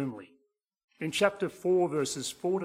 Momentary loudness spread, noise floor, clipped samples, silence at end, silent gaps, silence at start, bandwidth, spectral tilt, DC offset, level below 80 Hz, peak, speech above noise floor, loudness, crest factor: 11 LU; -73 dBFS; under 0.1%; 0 s; 0.84-0.88 s; 0 s; 15.5 kHz; -4.5 dB/octave; under 0.1%; -70 dBFS; -10 dBFS; 43 dB; -30 LUFS; 22 dB